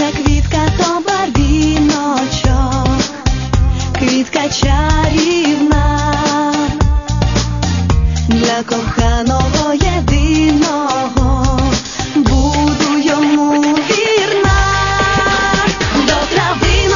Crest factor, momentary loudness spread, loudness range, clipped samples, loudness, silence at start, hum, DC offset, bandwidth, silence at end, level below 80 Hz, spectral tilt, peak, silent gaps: 12 dB; 4 LU; 2 LU; under 0.1%; -13 LUFS; 0 s; none; 0.3%; 7.4 kHz; 0 s; -18 dBFS; -5 dB/octave; 0 dBFS; none